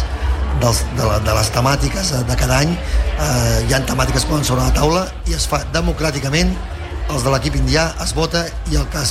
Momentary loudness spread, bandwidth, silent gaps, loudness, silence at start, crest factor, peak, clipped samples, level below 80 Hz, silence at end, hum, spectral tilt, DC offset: 5 LU; 15.5 kHz; none; -17 LUFS; 0 s; 14 dB; -2 dBFS; under 0.1%; -22 dBFS; 0 s; none; -4.5 dB/octave; under 0.1%